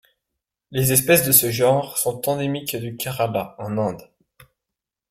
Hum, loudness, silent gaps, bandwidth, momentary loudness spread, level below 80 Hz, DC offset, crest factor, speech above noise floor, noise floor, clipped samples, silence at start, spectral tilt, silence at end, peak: none; -20 LUFS; none; 16.5 kHz; 14 LU; -56 dBFS; under 0.1%; 22 dB; 65 dB; -85 dBFS; under 0.1%; 0.7 s; -4 dB/octave; 1.1 s; 0 dBFS